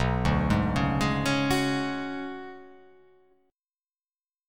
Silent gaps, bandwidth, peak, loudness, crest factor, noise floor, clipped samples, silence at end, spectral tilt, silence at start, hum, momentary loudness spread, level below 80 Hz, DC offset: 4.41-4.45 s; 18 kHz; -10 dBFS; -27 LUFS; 18 dB; under -90 dBFS; under 0.1%; 0 s; -6 dB/octave; 0 s; none; 15 LU; -40 dBFS; 0.3%